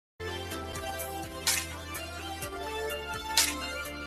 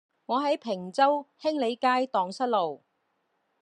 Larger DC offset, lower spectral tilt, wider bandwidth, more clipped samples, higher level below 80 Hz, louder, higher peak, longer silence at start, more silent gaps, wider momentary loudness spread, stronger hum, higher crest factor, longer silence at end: neither; second, -1.5 dB/octave vs -5 dB/octave; first, 16 kHz vs 11 kHz; neither; first, -52 dBFS vs -86 dBFS; second, -32 LUFS vs -27 LUFS; about the same, -8 dBFS vs -10 dBFS; about the same, 0.2 s vs 0.3 s; neither; first, 12 LU vs 7 LU; neither; first, 26 dB vs 18 dB; second, 0 s vs 0.85 s